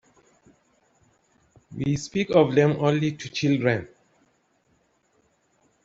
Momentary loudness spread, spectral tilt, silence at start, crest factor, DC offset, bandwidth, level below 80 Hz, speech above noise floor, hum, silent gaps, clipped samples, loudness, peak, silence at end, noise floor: 10 LU; -6.5 dB/octave; 1.7 s; 22 dB; under 0.1%; 8 kHz; -58 dBFS; 45 dB; none; none; under 0.1%; -23 LUFS; -4 dBFS; 2 s; -67 dBFS